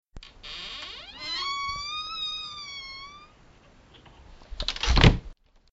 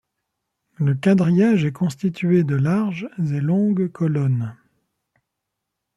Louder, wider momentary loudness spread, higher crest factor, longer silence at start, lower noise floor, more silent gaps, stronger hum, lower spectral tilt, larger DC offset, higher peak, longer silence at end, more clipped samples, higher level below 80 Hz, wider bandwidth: second, -28 LUFS vs -20 LUFS; first, 21 LU vs 8 LU; first, 28 dB vs 14 dB; second, 0.15 s vs 0.8 s; second, -55 dBFS vs -80 dBFS; neither; neither; second, -3.5 dB/octave vs -8.5 dB/octave; neither; first, -2 dBFS vs -6 dBFS; second, 0.4 s vs 1.45 s; neither; first, -34 dBFS vs -62 dBFS; second, 8 kHz vs 12 kHz